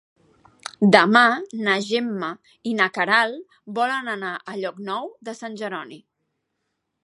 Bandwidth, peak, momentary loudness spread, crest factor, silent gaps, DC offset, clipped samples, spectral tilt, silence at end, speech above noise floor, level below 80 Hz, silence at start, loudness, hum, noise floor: 11.5 kHz; 0 dBFS; 19 LU; 24 dB; none; under 0.1%; under 0.1%; -5 dB/octave; 1.05 s; 55 dB; -72 dBFS; 0.8 s; -21 LUFS; none; -77 dBFS